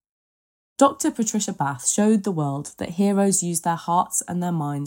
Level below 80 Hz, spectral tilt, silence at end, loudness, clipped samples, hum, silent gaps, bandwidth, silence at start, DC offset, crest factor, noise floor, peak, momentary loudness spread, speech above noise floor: -66 dBFS; -5 dB/octave; 0 s; -22 LUFS; under 0.1%; none; none; 16.5 kHz; 0.8 s; under 0.1%; 18 dB; under -90 dBFS; -4 dBFS; 7 LU; over 68 dB